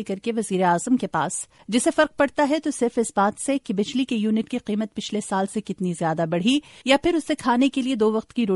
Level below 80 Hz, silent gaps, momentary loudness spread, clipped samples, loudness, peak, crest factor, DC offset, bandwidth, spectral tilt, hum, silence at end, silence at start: -58 dBFS; none; 7 LU; under 0.1%; -23 LUFS; -4 dBFS; 18 dB; under 0.1%; 11.5 kHz; -4.5 dB/octave; none; 0 s; 0 s